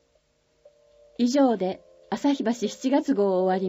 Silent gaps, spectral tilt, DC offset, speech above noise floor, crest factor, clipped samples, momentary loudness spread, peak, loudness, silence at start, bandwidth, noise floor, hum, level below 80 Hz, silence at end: none; -5.5 dB/octave; under 0.1%; 44 dB; 14 dB; under 0.1%; 12 LU; -10 dBFS; -24 LUFS; 1.2 s; 15 kHz; -67 dBFS; none; -70 dBFS; 0 s